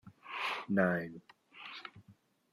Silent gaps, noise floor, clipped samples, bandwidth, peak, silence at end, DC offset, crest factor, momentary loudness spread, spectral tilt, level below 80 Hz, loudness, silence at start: none; -65 dBFS; under 0.1%; 13 kHz; -16 dBFS; 0.4 s; under 0.1%; 22 dB; 20 LU; -6.5 dB/octave; -78 dBFS; -36 LUFS; 0.05 s